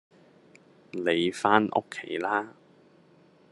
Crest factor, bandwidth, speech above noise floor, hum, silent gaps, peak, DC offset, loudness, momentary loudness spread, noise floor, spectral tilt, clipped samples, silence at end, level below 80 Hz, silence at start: 26 dB; 11.5 kHz; 32 dB; none; none; -4 dBFS; under 0.1%; -27 LUFS; 13 LU; -59 dBFS; -5 dB/octave; under 0.1%; 1 s; -74 dBFS; 0.95 s